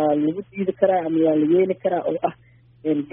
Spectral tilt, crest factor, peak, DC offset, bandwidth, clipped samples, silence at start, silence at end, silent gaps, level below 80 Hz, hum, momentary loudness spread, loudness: -4.5 dB/octave; 16 dB; -4 dBFS; under 0.1%; 3.7 kHz; under 0.1%; 0 s; 0.05 s; none; -64 dBFS; none; 8 LU; -21 LUFS